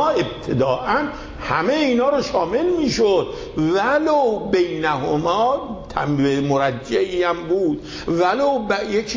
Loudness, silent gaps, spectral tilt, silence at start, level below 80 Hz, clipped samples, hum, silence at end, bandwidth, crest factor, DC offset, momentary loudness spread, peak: -20 LUFS; none; -5.5 dB/octave; 0 s; -44 dBFS; under 0.1%; none; 0 s; 7.6 kHz; 14 dB; under 0.1%; 6 LU; -6 dBFS